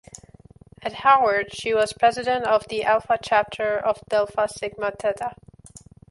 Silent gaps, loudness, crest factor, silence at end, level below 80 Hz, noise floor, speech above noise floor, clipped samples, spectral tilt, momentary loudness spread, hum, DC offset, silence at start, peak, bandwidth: none; -22 LUFS; 20 dB; 0.35 s; -56 dBFS; -49 dBFS; 27 dB; under 0.1%; -3.5 dB/octave; 10 LU; none; under 0.1%; 0.15 s; -4 dBFS; 11.5 kHz